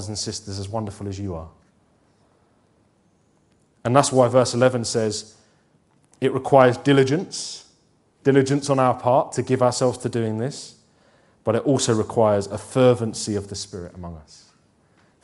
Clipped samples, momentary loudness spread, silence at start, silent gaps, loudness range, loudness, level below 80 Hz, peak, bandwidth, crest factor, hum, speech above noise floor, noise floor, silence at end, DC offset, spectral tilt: under 0.1%; 15 LU; 0 s; none; 6 LU; -21 LUFS; -56 dBFS; 0 dBFS; 11.5 kHz; 22 dB; none; 41 dB; -62 dBFS; 1.05 s; under 0.1%; -5.5 dB/octave